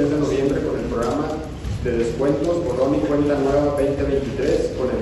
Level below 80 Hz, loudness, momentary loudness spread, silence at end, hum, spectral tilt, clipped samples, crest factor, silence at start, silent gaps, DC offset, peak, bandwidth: -34 dBFS; -21 LUFS; 5 LU; 0 s; none; -7 dB/octave; under 0.1%; 14 dB; 0 s; none; under 0.1%; -6 dBFS; 12 kHz